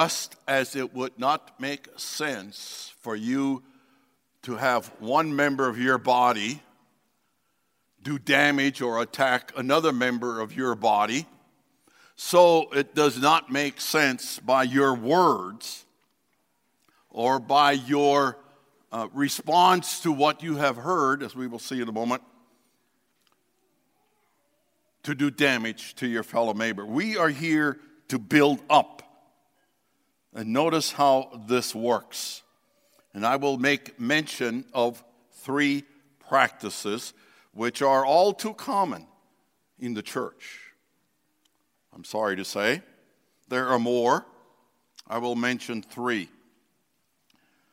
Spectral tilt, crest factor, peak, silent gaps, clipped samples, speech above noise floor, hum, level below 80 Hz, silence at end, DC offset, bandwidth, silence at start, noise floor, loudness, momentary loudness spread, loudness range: -4 dB/octave; 24 dB; -2 dBFS; none; under 0.1%; 49 dB; none; -76 dBFS; 1.45 s; under 0.1%; 16 kHz; 0 s; -73 dBFS; -25 LUFS; 14 LU; 9 LU